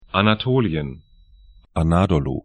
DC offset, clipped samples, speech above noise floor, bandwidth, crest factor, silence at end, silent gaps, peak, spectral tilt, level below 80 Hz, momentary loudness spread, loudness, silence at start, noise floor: under 0.1%; under 0.1%; 30 dB; 10 kHz; 20 dB; 0.05 s; none; 0 dBFS; -7.5 dB/octave; -36 dBFS; 11 LU; -20 LUFS; 0.15 s; -49 dBFS